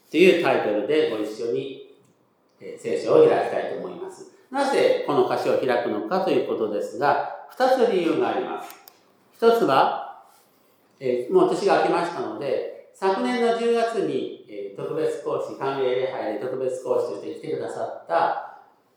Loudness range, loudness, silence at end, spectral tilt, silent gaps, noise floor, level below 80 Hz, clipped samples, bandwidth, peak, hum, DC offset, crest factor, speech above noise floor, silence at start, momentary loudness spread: 4 LU; -23 LUFS; 0.4 s; -5.5 dB/octave; none; -62 dBFS; -84 dBFS; under 0.1%; 16 kHz; -4 dBFS; none; under 0.1%; 20 dB; 40 dB; 0.1 s; 14 LU